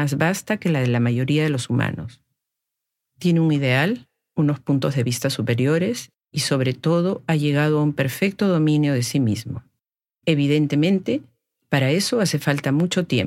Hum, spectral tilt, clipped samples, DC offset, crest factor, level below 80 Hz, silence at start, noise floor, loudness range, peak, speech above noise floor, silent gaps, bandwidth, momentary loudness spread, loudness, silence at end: none; -6 dB/octave; under 0.1%; under 0.1%; 16 dB; -62 dBFS; 0 s; -82 dBFS; 2 LU; -6 dBFS; 62 dB; none; 16 kHz; 8 LU; -21 LUFS; 0 s